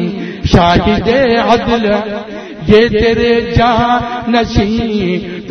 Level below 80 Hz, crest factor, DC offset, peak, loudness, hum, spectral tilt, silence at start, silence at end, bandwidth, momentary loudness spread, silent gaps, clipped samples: -28 dBFS; 12 dB; under 0.1%; 0 dBFS; -12 LUFS; none; -6.5 dB/octave; 0 s; 0 s; 6.6 kHz; 10 LU; none; 0.2%